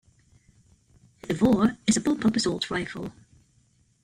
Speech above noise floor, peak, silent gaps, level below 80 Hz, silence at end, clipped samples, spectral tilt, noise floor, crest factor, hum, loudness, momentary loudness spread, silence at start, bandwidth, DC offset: 40 dB; -10 dBFS; none; -54 dBFS; 0.95 s; under 0.1%; -4.5 dB/octave; -64 dBFS; 18 dB; none; -25 LUFS; 16 LU; 1.25 s; 13 kHz; under 0.1%